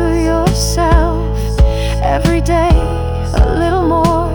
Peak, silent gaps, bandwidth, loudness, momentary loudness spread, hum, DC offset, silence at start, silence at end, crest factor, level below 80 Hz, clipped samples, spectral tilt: 0 dBFS; none; 19 kHz; -14 LUFS; 5 LU; none; under 0.1%; 0 s; 0 s; 12 dB; -16 dBFS; under 0.1%; -6 dB/octave